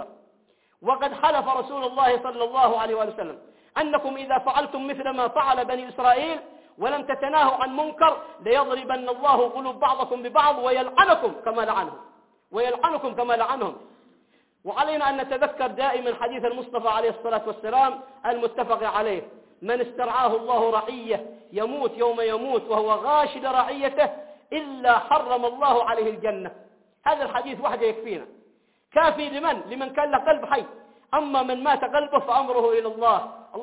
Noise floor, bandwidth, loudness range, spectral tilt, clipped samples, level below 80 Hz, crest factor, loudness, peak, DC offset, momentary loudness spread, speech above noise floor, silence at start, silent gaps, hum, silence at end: -64 dBFS; 4 kHz; 4 LU; -7.5 dB/octave; under 0.1%; -62 dBFS; 20 dB; -24 LUFS; -4 dBFS; under 0.1%; 9 LU; 41 dB; 0 s; none; none; 0 s